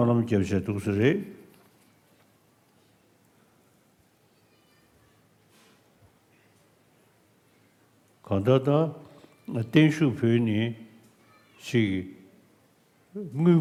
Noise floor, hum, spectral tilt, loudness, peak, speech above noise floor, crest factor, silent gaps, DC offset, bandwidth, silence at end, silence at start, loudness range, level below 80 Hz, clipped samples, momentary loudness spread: -64 dBFS; none; -7.5 dB/octave; -25 LUFS; -6 dBFS; 40 dB; 22 dB; none; under 0.1%; 14.5 kHz; 0 s; 0 s; 7 LU; -70 dBFS; under 0.1%; 21 LU